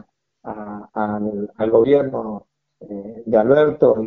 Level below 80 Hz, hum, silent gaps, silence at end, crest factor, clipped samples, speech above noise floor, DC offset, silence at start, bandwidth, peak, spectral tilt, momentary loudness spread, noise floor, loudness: -56 dBFS; none; none; 0 s; 18 dB; under 0.1%; 22 dB; under 0.1%; 0.45 s; 4.1 kHz; 0 dBFS; -6.5 dB/octave; 20 LU; -39 dBFS; -18 LUFS